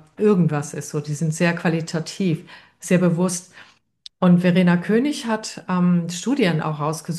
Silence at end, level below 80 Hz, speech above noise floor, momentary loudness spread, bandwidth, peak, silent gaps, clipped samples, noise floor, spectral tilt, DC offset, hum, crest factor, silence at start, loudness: 0 s; -66 dBFS; 28 dB; 10 LU; 12.5 kHz; -4 dBFS; none; under 0.1%; -48 dBFS; -6 dB/octave; under 0.1%; none; 16 dB; 0.2 s; -21 LUFS